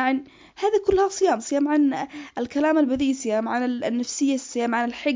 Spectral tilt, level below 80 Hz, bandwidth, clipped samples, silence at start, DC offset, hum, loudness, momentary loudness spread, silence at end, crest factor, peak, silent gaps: -4 dB/octave; -52 dBFS; 7.6 kHz; under 0.1%; 0 s; under 0.1%; none; -23 LUFS; 7 LU; 0 s; 14 dB; -8 dBFS; none